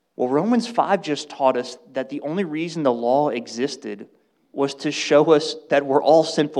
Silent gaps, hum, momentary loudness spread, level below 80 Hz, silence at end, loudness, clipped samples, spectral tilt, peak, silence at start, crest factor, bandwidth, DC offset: none; none; 13 LU; -80 dBFS; 0 s; -21 LUFS; under 0.1%; -5 dB/octave; -4 dBFS; 0.2 s; 18 dB; 11 kHz; under 0.1%